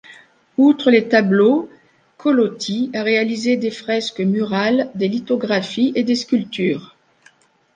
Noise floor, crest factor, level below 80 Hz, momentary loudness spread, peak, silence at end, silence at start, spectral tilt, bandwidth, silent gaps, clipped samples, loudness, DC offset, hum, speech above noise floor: -54 dBFS; 16 dB; -66 dBFS; 8 LU; -2 dBFS; 0.9 s; 0.1 s; -5.5 dB/octave; 9.4 kHz; none; under 0.1%; -18 LUFS; under 0.1%; none; 37 dB